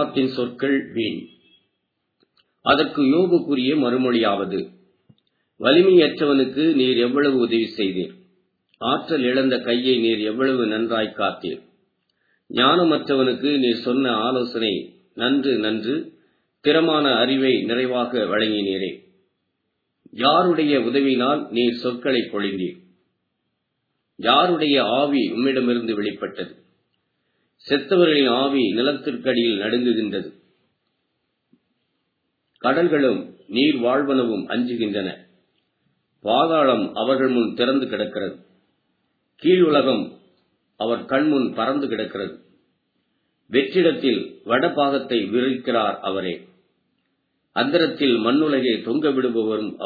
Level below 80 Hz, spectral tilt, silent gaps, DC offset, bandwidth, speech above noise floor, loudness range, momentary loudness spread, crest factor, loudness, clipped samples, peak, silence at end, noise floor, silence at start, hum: -70 dBFS; -8 dB/octave; none; under 0.1%; 4.9 kHz; 55 dB; 4 LU; 11 LU; 20 dB; -20 LUFS; under 0.1%; 0 dBFS; 0 s; -75 dBFS; 0 s; none